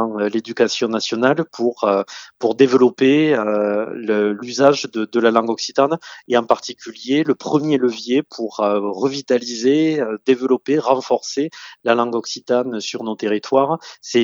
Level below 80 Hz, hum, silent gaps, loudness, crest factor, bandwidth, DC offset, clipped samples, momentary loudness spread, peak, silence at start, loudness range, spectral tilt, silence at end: -70 dBFS; none; none; -18 LUFS; 18 dB; 7.6 kHz; under 0.1%; under 0.1%; 8 LU; 0 dBFS; 0 s; 3 LU; -5 dB/octave; 0 s